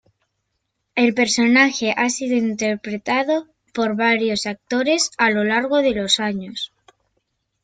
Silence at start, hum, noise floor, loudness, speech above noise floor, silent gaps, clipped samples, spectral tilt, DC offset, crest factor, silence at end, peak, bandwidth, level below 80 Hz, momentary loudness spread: 0.95 s; none; -74 dBFS; -19 LUFS; 55 dB; none; under 0.1%; -3 dB/octave; under 0.1%; 18 dB; 1 s; -2 dBFS; 9.4 kHz; -58 dBFS; 11 LU